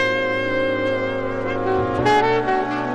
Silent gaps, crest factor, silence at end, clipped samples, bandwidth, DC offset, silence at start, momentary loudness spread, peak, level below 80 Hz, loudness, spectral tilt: none; 14 dB; 0 s; under 0.1%; 11 kHz; under 0.1%; 0 s; 6 LU; -6 dBFS; -44 dBFS; -20 LUFS; -6 dB/octave